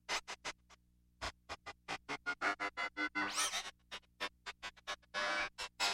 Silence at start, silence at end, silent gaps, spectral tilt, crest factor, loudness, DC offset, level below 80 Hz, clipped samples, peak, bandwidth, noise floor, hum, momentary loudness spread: 0.1 s; 0 s; none; -0.5 dB/octave; 20 dB; -41 LUFS; under 0.1%; -66 dBFS; under 0.1%; -24 dBFS; 16 kHz; -68 dBFS; 60 Hz at -75 dBFS; 12 LU